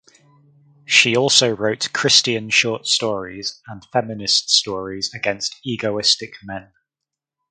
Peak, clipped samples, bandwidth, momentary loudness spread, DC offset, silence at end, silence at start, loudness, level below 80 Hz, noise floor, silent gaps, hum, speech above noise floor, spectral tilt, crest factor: 0 dBFS; under 0.1%; 11 kHz; 15 LU; under 0.1%; 0.9 s; 0.9 s; -17 LUFS; -58 dBFS; -85 dBFS; none; none; 65 dB; -2 dB/octave; 20 dB